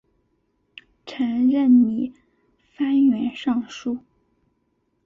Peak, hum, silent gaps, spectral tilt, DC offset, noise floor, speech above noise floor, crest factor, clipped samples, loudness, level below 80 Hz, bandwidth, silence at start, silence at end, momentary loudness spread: -8 dBFS; none; none; -6 dB/octave; under 0.1%; -70 dBFS; 50 dB; 16 dB; under 0.1%; -21 LUFS; -64 dBFS; 7 kHz; 1.05 s; 1.05 s; 16 LU